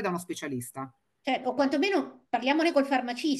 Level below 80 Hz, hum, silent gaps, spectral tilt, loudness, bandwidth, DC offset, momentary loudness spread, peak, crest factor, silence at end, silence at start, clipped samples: -76 dBFS; none; none; -4.5 dB/octave; -28 LUFS; 12.5 kHz; under 0.1%; 13 LU; -12 dBFS; 18 dB; 0 s; 0 s; under 0.1%